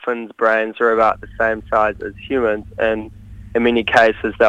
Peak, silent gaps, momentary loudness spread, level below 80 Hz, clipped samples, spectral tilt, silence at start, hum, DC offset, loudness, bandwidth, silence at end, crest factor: 0 dBFS; none; 10 LU; -42 dBFS; under 0.1%; -5.5 dB/octave; 0.05 s; none; under 0.1%; -17 LUFS; 9.4 kHz; 0 s; 18 dB